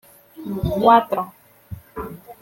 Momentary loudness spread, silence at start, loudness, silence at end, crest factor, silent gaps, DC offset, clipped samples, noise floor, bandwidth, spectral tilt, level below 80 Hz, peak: 23 LU; 0.4 s; -18 LUFS; 0.1 s; 20 dB; none; under 0.1%; under 0.1%; -39 dBFS; 17 kHz; -7.5 dB/octave; -42 dBFS; -2 dBFS